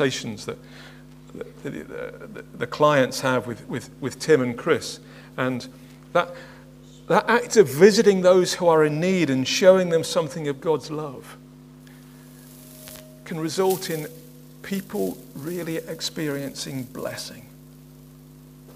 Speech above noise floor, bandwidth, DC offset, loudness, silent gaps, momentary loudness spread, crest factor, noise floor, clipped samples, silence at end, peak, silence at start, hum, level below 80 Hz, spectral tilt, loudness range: 24 dB; 16 kHz; under 0.1%; -22 LUFS; none; 23 LU; 22 dB; -46 dBFS; under 0.1%; 0.05 s; 0 dBFS; 0 s; none; -58 dBFS; -4.5 dB/octave; 12 LU